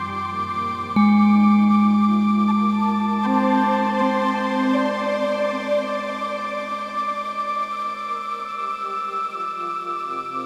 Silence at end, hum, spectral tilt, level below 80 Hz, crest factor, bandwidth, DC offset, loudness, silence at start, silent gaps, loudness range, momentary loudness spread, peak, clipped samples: 0 s; none; -7 dB/octave; -66 dBFS; 14 dB; 8.8 kHz; under 0.1%; -21 LUFS; 0 s; none; 8 LU; 11 LU; -6 dBFS; under 0.1%